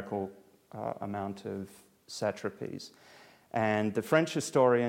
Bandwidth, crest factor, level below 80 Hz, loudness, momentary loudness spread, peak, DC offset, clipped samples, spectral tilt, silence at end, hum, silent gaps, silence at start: 16.5 kHz; 22 dB; -74 dBFS; -32 LUFS; 17 LU; -10 dBFS; under 0.1%; under 0.1%; -5.5 dB/octave; 0 s; none; none; 0 s